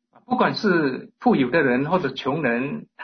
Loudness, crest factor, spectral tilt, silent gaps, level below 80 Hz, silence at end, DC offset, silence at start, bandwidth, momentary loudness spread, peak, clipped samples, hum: -22 LUFS; 16 dB; -7 dB/octave; none; -60 dBFS; 0 s; under 0.1%; 0.3 s; 6.4 kHz; 7 LU; -6 dBFS; under 0.1%; none